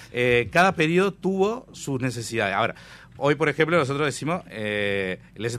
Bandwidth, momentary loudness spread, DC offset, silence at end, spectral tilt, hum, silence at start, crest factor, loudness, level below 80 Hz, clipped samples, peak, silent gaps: 15 kHz; 9 LU; under 0.1%; 0 s; -5 dB/octave; none; 0 s; 18 dB; -23 LUFS; -54 dBFS; under 0.1%; -6 dBFS; none